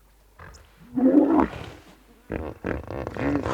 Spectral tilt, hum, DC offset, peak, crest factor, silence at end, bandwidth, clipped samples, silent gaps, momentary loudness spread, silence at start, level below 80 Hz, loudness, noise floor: -8 dB/octave; none; under 0.1%; -6 dBFS; 20 dB; 0 s; 8.4 kHz; under 0.1%; none; 17 LU; 0.4 s; -44 dBFS; -24 LUFS; -52 dBFS